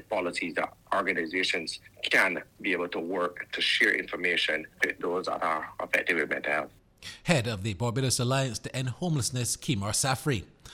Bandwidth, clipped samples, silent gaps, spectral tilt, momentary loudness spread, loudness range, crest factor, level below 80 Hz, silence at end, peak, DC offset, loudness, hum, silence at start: 17.5 kHz; under 0.1%; none; -3.5 dB/octave; 9 LU; 2 LU; 22 dB; -58 dBFS; 0 s; -8 dBFS; under 0.1%; -28 LUFS; none; 0.1 s